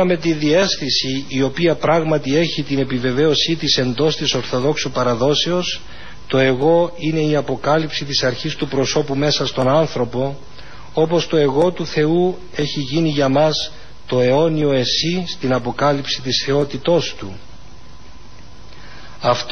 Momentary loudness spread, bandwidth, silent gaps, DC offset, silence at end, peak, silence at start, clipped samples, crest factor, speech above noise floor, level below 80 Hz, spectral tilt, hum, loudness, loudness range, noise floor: 7 LU; 6.6 kHz; none; 3%; 0 s; -2 dBFS; 0 s; under 0.1%; 16 dB; 24 dB; -46 dBFS; -5 dB/octave; none; -18 LUFS; 2 LU; -41 dBFS